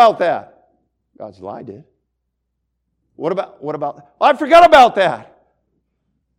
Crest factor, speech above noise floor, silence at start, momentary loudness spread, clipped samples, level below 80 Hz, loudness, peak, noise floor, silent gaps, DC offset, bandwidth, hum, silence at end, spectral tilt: 16 dB; 59 dB; 0 s; 23 LU; under 0.1%; -50 dBFS; -13 LUFS; 0 dBFS; -73 dBFS; none; under 0.1%; 12 kHz; none; 1.2 s; -4.5 dB/octave